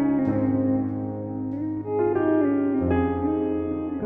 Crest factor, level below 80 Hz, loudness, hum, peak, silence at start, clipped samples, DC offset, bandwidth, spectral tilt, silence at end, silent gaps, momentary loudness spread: 12 dB; -48 dBFS; -24 LUFS; none; -10 dBFS; 0 s; under 0.1%; under 0.1%; 3.6 kHz; -12 dB/octave; 0 s; none; 8 LU